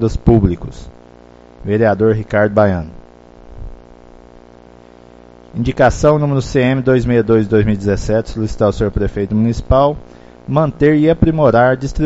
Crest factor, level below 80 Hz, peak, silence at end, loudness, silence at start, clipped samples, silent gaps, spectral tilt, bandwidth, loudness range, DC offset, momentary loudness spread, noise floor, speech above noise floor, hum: 14 dB; -28 dBFS; 0 dBFS; 0 s; -14 LUFS; 0 s; under 0.1%; none; -7.5 dB/octave; 8 kHz; 6 LU; under 0.1%; 10 LU; -41 dBFS; 28 dB; 60 Hz at -45 dBFS